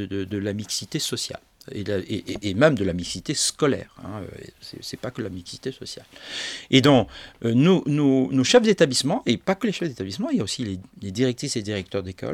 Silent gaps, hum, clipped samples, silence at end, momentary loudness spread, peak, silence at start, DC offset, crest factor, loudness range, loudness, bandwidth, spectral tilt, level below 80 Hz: none; none; under 0.1%; 0 s; 17 LU; 0 dBFS; 0 s; under 0.1%; 22 dB; 8 LU; -23 LUFS; 15.5 kHz; -4.5 dB/octave; -56 dBFS